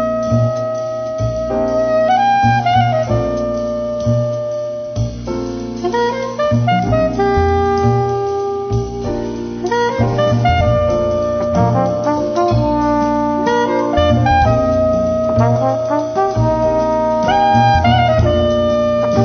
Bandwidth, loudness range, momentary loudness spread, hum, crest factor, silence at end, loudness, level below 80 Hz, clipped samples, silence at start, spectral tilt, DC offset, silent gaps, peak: 6.6 kHz; 4 LU; 9 LU; none; 12 dB; 0 s; -15 LUFS; -30 dBFS; under 0.1%; 0 s; -7 dB/octave; under 0.1%; none; -2 dBFS